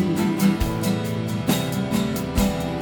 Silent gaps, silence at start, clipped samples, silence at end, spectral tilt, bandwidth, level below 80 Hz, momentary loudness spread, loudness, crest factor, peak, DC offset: none; 0 s; under 0.1%; 0 s; -5.5 dB/octave; 19 kHz; -36 dBFS; 4 LU; -23 LUFS; 16 dB; -6 dBFS; under 0.1%